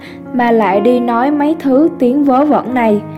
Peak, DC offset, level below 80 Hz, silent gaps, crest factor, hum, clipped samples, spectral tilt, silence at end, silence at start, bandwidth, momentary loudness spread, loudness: 0 dBFS; under 0.1%; -56 dBFS; none; 12 dB; none; under 0.1%; -8 dB/octave; 0 s; 0 s; 13.5 kHz; 3 LU; -12 LUFS